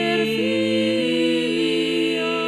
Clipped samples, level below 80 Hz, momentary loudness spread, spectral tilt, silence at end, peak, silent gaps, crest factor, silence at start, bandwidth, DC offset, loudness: under 0.1%; -62 dBFS; 1 LU; -4.5 dB/octave; 0 s; -10 dBFS; none; 10 dB; 0 s; 14 kHz; under 0.1%; -20 LUFS